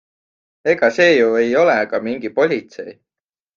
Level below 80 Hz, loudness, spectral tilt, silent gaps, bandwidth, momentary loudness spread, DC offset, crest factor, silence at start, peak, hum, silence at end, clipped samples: -62 dBFS; -16 LUFS; -5 dB/octave; none; 7.4 kHz; 16 LU; under 0.1%; 16 dB; 0.65 s; -2 dBFS; none; 0.65 s; under 0.1%